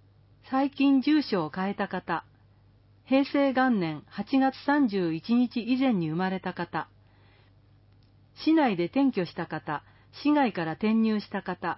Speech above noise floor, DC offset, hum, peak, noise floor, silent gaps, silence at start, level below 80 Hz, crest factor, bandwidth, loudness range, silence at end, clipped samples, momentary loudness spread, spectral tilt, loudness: 33 dB; under 0.1%; none; -12 dBFS; -59 dBFS; none; 0.45 s; -66 dBFS; 16 dB; 5.8 kHz; 4 LU; 0 s; under 0.1%; 10 LU; -10.5 dB/octave; -27 LUFS